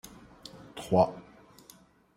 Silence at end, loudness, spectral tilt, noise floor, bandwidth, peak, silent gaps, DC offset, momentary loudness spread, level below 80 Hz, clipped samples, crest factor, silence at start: 0.95 s; -27 LUFS; -6.5 dB/octave; -58 dBFS; 16 kHz; -12 dBFS; none; under 0.1%; 23 LU; -62 dBFS; under 0.1%; 22 dB; 0.55 s